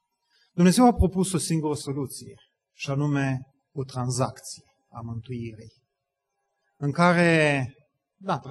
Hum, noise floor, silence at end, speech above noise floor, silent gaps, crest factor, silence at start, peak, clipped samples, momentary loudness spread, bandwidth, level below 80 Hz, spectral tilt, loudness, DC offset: none; -82 dBFS; 0 s; 58 dB; none; 20 dB; 0.55 s; -6 dBFS; under 0.1%; 20 LU; 12.5 kHz; -42 dBFS; -5.5 dB/octave; -24 LUFS; under 0.1%